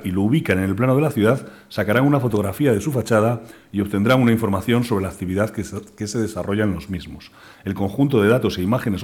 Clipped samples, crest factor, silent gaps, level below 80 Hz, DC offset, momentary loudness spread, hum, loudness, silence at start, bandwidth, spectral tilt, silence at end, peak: under 0.1%; 14 dB; none; -48 dBFS; under 0.1%; 13 LU; none; -20 LUFS; 0 s; 18 kHz; -7 dB/octave; 0 s; -6 dBFS